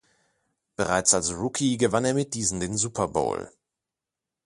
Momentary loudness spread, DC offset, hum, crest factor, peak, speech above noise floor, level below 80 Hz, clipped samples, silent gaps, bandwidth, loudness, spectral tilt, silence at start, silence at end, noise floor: 10 LU; under 0.1%; none; 20 dB; -6 dBFS; 63 dB; -52 dBFS; under 0.1%; none; 11.5 kHz; -25 LUFS; -3.5 dB/octave; 0.8 s; 0.95 s; -88 dBFS